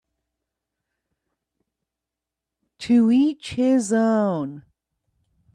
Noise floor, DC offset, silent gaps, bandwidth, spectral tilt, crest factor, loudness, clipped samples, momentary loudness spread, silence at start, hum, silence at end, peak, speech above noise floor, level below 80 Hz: -86 dBFS; under 0.1%; none; 10.5 kHz; -6 dB/octave; 16 dB; -20 LUFS; under 0.1%; 12 LU; 2.8 s; none; 0.95 s; -8 dBFS; 67 dB; -64 dBFS